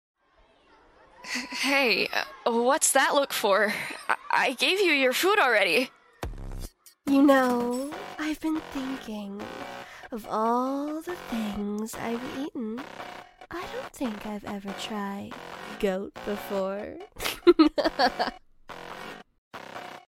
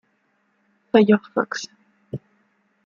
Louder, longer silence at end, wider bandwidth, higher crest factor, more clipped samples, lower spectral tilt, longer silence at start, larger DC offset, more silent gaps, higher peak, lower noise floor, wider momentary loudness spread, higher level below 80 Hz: second, -26 LUFS vs -20 LUFS; second, 0.1 s vs 0.7 s; first, 16.5 kHz vs 7.4 kHz; about the same, 22 dB vs 22 dB; neither; second, -3 dB/octave vs -6 dB/octave; first, 1.2 s vs 0.95 s; neither; first, 19.38-19.51 s vs none; second, -6 dBFS vs -2 dBFS; second, -62 dBFS vs -67 dBFS; about the same, 20 LU vs 20 LU; first, -52 dBFS vs -68 dBFS